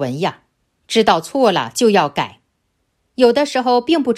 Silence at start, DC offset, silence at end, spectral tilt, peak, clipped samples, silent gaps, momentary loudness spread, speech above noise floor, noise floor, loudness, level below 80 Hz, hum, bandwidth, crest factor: 0 s; under 0.1%; 0 s; -4.5 dB/octave; 0 dBFS; under 0.1%; none; 9 LU; 53 dB; -68 dBFS; -16 LUFS; -58 dBFS; none; 14 kHz; 16 dB